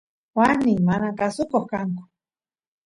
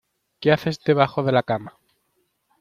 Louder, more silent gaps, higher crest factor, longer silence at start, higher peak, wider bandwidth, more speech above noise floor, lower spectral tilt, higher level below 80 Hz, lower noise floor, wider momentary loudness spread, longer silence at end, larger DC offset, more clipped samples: about the same, -22 LUFS vs -21 LUFS; neither; about the same, 18 dB vs 20 dB; about the same, 0.35 s vs 0.4 s; about the same, -4 dBFS vs -2 dBFS; second, 11.5 kHz vs 14.5 kHz; first, over 69 dB vs 50 dB; about the same, -7.5 dB/octave vs -7 dB/octave; about the same, -56 dBFS vs -60 dBFS; first, under -90 dBFS vs -70 dBFS; first, 11 LU vs 7 LU; about the same, 0.85 s vs 0.9 s; neither; neither